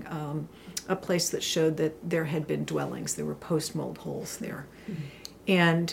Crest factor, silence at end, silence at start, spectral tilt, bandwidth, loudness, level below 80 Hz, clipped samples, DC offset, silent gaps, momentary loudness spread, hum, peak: 20 dB; 0 s; 0 s; -4.5 dB/octave; 16.5 kHz; -30 LUFS; -62 dBFS; under 0.1%; under 0.1%; none; 13 LU; none; -10 dBFS